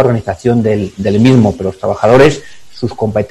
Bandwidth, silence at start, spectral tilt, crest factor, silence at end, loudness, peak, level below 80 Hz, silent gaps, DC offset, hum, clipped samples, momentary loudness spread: 12 kHz; 0 s; -7.5 dB/octave; 12 dB; 0.05 s; -11 LUFS; 0 dBFS; -38 dBFS; none; under 0.1%; none; 1%; 11 LU